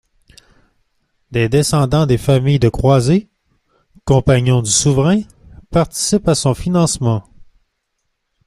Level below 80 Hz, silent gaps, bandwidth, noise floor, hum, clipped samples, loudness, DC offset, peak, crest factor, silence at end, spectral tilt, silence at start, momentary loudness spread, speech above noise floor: -36 dBFS; none; 14 kHz; -70 dBFS; none; under 0.1%; -15 LUFS; under 0.1%; 0 dBFS; 16 dB; 1.05 s; -5.5 dB/octave; 1.3 s; 7 LU; 57 dB